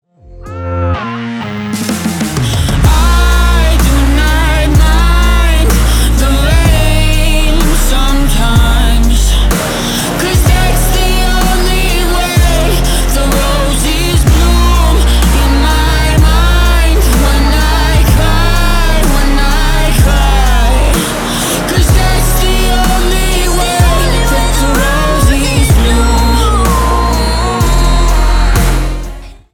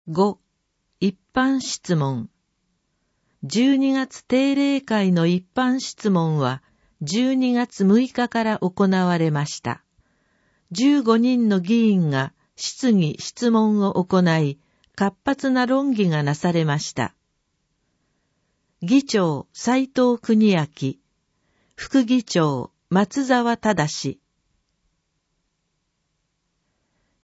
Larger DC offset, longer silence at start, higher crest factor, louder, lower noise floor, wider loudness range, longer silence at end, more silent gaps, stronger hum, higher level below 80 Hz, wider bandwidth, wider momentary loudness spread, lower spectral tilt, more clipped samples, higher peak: neither; first, 0.3 s vs 0.05 s; second, 8 dB vs 18 dB; first, -11 LUFS vs -21 LUFS; second, -30 dBFS vs -74 dBFS; about the same, 2 LU vs 4 LU; second, 0.2 s vs 3.15 s; neither; neither; first, -10 dBFS vs -62 dBFS; first, 18 kHz vs 8 kHz; second, 4 LU vs 11 LU; second, -4.5 dB/octave vs -6 dB/octave; neither; first, 0 dBFS vs -4 dBFS